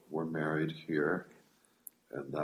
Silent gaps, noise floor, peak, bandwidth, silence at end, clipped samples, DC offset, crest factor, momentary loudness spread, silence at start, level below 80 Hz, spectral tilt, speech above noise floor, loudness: none; -58 dBFS; -18 dBFS; 15.5 kHz; 0 s; under 0.1%; under 0.1%; 18 dB; 21 LU; 0.1 s; -74 dBFS; -7 dB/octave; 23 dB; -36 LUFS